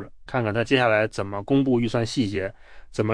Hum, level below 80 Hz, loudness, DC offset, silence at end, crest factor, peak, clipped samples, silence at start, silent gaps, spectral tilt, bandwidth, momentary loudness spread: none; -50 dBFS; -23 LUFS; under 0.1%; 0 s; 18 dB; -6 dBFS; under 0.1%; 0 s; none; -6 dB/octave; 10.5 kHz; 11 LU